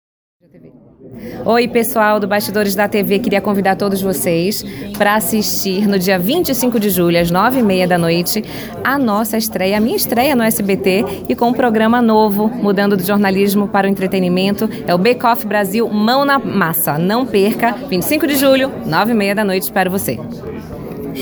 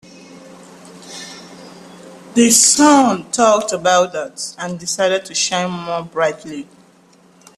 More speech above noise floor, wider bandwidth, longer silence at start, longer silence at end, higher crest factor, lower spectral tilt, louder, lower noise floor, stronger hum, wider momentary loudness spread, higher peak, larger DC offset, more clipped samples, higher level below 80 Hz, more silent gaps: second, 28 dB vs 34 dB; first, over 20 kHz vs 14 kHz; first, 0.65 s vs 0.3 s; second, 0 s vs 0.95 s; about the same, 14 dB vs 18 dB; first, -5 dB/octave vs -2.5 dB/octave; about the same, -14 LUFS vs -15 LUFS; second, -42 dBFS vs -50 dBFS; neither; second, 6 LU vs 22 LU; about the same, 0 dBFS vs 0 dBFS; neither; neither; first, -46 dBFS vs -60 dBFS; neither